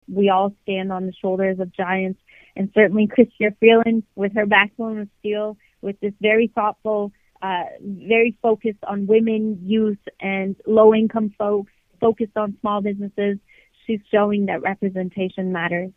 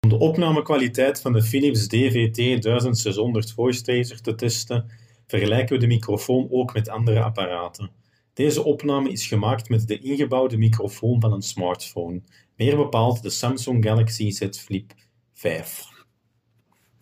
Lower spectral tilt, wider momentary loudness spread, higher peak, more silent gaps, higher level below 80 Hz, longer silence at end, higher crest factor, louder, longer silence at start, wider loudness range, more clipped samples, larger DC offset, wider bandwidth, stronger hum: first, -9 dB/octave vs -6 dB/octave; about the same, 12 LU vs 10 LU; first, 0 dBFS vs -6 dBFS; neither; about the same, -60 dBFS vs -56 dBFS; second, 0.05 s vs 1.15 s; about the same, 20 dB vs 16 dB; about the same, -20 LUFS vs -22 LUFS; about the same, 0.1 s vs 0.05 s; about the same, 5 LU vs 3 LU; neither; neither; second, 3.8 kHz vs 16 kHz; neither